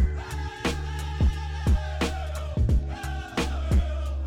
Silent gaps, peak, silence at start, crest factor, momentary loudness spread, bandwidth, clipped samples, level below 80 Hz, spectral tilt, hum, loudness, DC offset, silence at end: none; -16 dBFS; 0 s; 10 dB; 7 LU; 13.5 kHz; under 0.1%; -28 dBFS; -6 dB/octave; none; -28 LUFS; under 0.1%; 0 s